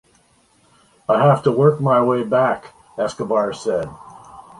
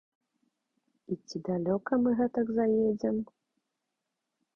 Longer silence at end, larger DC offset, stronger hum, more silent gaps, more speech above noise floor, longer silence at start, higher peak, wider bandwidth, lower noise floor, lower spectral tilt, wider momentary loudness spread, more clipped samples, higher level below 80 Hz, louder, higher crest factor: second, 0.2 s vs 1.3 s; neither; neither; neither; second, 40 dB vs 56 dB; about the same, 1.1 s vs 1.1 s; first, -2 dBFS vs -16 dBFS; first, 11.5 kHz vs 7 kHz; second, -57 dBFS vs -85 dBFS; about the same, -7.5 dB/octave vs -8 dB/octave; about the same, 13 LU vs 12 LU; neither; first, -56 dBFS vs -66 dBFS; first, -18 LUFS vs -30 LUFS; about the same, 16 dB vs 16 dB